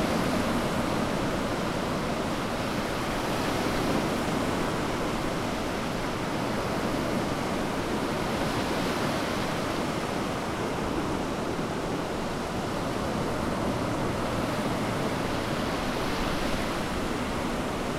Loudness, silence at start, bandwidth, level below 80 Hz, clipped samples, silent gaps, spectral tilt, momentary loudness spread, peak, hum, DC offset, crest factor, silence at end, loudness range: -29 LUFS; 0 s; 16 kHz; -42 dBFS; under 0.1%; none; -5 dB/octave; 3 LU; -14 dBFS; none; under 0.1%; 14 dB; 0 s; 2 LU